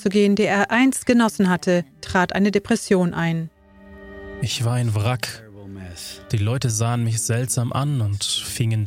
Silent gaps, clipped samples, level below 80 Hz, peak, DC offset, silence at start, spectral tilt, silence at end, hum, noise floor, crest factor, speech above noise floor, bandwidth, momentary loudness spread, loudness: none; under 0.1%; -50 dBFS; -2 dBFS; under 0.1%; 0 s; -5 dB/octave; 0 s; none; -45 dBFS; 18 dB; 25 dB; 16.5 kHz; 17 LU; -21 LUFS